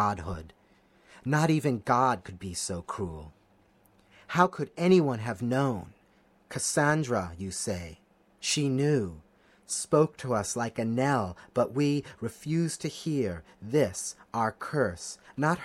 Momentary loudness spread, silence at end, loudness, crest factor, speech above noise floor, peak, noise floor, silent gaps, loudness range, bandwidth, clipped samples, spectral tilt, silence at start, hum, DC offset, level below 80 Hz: 13 LU; 0 s; -29 LUFS; 22 dB; 35 dB; -8 dBFS; -63 dBFS; none; 2 LU; 14 kHz; under 0.1%; -5 dB/octave; 0 s; none; under 0.1%; -58 dBFS